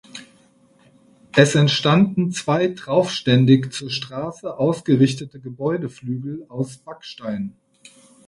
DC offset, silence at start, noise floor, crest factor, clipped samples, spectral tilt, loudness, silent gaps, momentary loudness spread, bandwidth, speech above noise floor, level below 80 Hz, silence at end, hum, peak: under 0.1%; 0.15 s; -55 dBFS; 20 dB; under 0.1%; -6 dB/octave; -20 LUFS; none; 16 LU; 11.5 kHz; 36 dB; -58 dBFS; 0.75 s; none; 0 dBFS